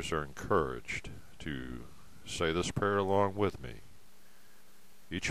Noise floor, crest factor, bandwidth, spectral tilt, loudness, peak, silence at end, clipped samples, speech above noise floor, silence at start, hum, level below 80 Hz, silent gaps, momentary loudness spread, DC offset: -63 dBFS; 20 dB; 15 kHz; -5 dB/octave; -34 LUFS; -16 dBFS; 0 s; under 0.1%; 29 dB; 0 s; none; -54 dBFS; none; 19 LU; 0.5%